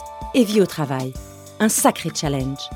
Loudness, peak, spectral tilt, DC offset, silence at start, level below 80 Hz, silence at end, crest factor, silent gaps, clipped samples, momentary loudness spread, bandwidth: -20 LUFS; -2 dBFS; -4.5 dB/octave; under 0.1%; 0 s; -42 dBFS; 0 s; 18 dB; none; under 0.1%; 13 LU; 18.5 kHz